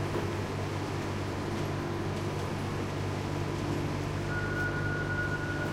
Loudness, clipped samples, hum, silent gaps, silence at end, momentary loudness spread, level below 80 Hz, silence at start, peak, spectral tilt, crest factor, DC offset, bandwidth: -33 LUFS; under 0.1%; none; none; 0 s; 3 LU; -48 dBFS; 0 s; -20 dBFS; -6 dB/octave; 12 dB; under 0.1%; 15.5 kHz